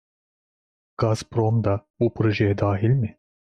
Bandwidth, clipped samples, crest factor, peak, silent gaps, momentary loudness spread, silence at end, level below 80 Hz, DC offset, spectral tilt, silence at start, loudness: 9.8 kHz; under 0.1%; 16 dB; -8 dBFS; 1.90-1.94 s; 5 LU; 0.4 s; -54 dBFS; under 0.1%; -8 dB/octave; 1 s; -23 LUFS